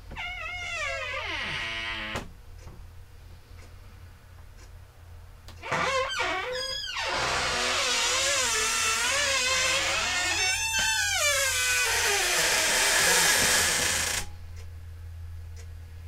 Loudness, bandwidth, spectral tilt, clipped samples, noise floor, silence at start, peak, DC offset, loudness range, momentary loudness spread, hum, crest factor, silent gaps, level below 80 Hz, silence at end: -24 LUFS; 16 kHz; 0 dB/octave; under 0.1%; -48 dBFS; 0 s; -10 dBFS; under 0.1%; 13 LU; 21 LU; none; 18 dB; none; -48 dBFS; 0 s